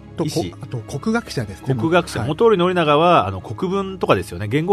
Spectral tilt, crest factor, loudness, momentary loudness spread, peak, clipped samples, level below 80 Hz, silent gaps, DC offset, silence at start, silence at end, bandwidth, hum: -6 dB/octave; 18 dB; -19 LUFS; 11 LU; 0 dBFS; under 0.1%; -46 dBFS; none; under 0.1%; 0 s; 0 s; 13.5 kHz; none